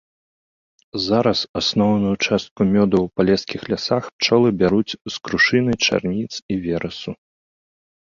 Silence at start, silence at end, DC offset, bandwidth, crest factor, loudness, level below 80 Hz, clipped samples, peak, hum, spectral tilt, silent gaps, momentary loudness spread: 0.95 s; 0.85 s; under 0.1%; 7.4 kHz; 18 dB; -19 LUFS; -48 dBFS; under 0.1%; -2 dBFS; none; -5 dB/octave; 1.49-1.54 s, 2.51-2.56 s, 4.13-4.19 s, 5.01-5.05 s, 6.42-6.49 s; 10 LU